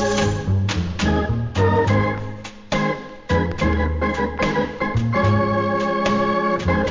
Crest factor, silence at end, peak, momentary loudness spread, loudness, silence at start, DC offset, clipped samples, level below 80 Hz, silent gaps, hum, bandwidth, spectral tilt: 14 dB; 0 s; -6 dBFS; 5 LU; -20 LUFS; 0 s; 0.2%; under 0.1%; -30 dBFS; none; none; 7.6 kHz; -6.5 dB/octave